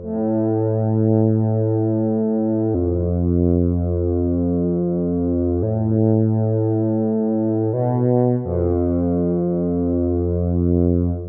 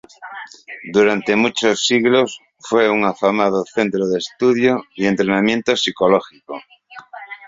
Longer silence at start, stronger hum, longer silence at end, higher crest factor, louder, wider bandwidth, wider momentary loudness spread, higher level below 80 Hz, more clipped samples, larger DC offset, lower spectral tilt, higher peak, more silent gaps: second, 0 s vs 0.2 s; neither; about the same, 0 s vs 0 s; about the same, 14 dB vs 16 dB; about the same, -19 LUFS vs -17 LUFS; second, 2.1 kHz vs 7.8 kHz; second, 3 LU vs 18 LU; first, -44 dBFS vs -58 dBFS; neither; neither; first, -16.5 dB/octave vs -4.5 dB/octave; about the same, -4 dBFS vs -2 dBFS; neither